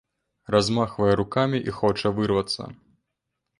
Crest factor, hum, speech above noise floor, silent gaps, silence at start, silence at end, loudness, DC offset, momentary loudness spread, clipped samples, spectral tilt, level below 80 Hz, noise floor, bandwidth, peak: 20 dB; none; 58 dB; none; 0.5 s; 0.85 s; -24 LUFS; under 0.1%; 6 LU; under 0.1%; -6 dB/octave; -50 dBFS; -81 dBFS; 11 kHz; -4 dBFS